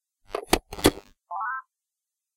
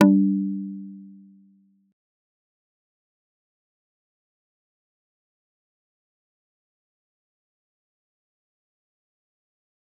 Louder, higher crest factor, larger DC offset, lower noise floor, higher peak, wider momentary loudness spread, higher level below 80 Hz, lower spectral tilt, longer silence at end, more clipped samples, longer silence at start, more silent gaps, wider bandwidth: second, -27 LUFS vs -23 LUFS; about the same, 30 dB vs 28 dB; neither; first, -87 dBFS vs -60 dBFS; about the same, 0 dBFS vs -2 dBFS; second, 14 LU vs 23 LU; first, -44 dBFS vs -86 dBFS; second, -3.5 dB/octave vs -7.5 dB/octave; second, 0.75 s vs 8.9 s; neither; first, 0.3 s vs 0 s; neither; first, 17 kHz vs 3.7 kHz